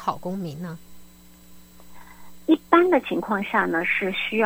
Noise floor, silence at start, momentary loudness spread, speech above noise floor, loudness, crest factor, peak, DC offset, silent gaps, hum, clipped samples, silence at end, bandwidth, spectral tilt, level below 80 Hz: -48 dBFS; 0 s; 16 LU; 25 dB; -22 LUFS; 22 dB; -2 dBFS; under 0.1%; none; none; under 0.1%; 0 s; 16.5 kHz; -6 dB/octave; -58 dBFS